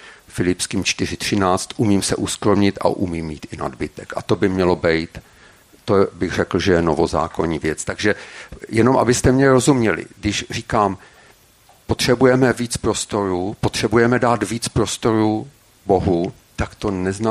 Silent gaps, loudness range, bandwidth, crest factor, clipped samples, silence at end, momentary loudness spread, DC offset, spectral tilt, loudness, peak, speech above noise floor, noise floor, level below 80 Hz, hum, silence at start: none; 3 LU; 15 kHz; 18 dB; under 0.1%; 0 s; 13 LU; under 0.1%; -5 dB/octave; -19 LUFS; -2 dBFS; 33 dB; -52 dBFS; -40 dBFS; none; 0.05 s